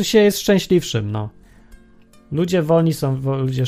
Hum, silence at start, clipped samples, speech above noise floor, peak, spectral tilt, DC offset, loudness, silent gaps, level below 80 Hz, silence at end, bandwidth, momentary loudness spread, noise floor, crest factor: none; 0 s; under 0.1%; 31 dB; -2 dBFS; -6 dB/octave; under 0.1%; -18 LUFS; none; -48 dBFS; 0 s; 15.5 kHz; 12 LU; -48 dBFS; 16 dB